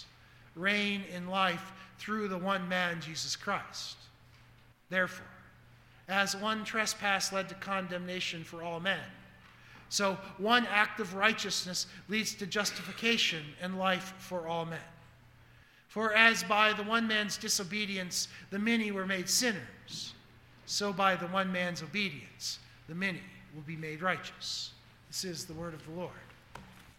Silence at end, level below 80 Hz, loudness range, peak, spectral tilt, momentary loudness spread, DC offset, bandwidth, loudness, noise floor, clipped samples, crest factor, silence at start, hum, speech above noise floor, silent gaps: 0.05 s; -68 dBFS; 8 LU; -6 dBFS; -2.5 dB/octave; 15 LU; under 0.1%; 17.5 kHz; -32 LUFS; -60 dBFS; under 0.1%; 28 dB; 0 s; none; 27 dB; none